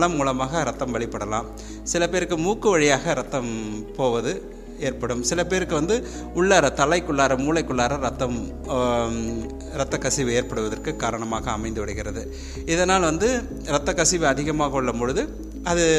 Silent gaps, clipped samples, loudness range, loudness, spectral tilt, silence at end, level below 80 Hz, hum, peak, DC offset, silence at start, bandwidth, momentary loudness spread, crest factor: none; under 0.1%; 4 LU; -23 LUFS; -4 dB/octave; 0 s; -38 dBFS; none; -4 dBFS; under 0.1%; 0 s; 15 kHz; 11 LU; 20 dB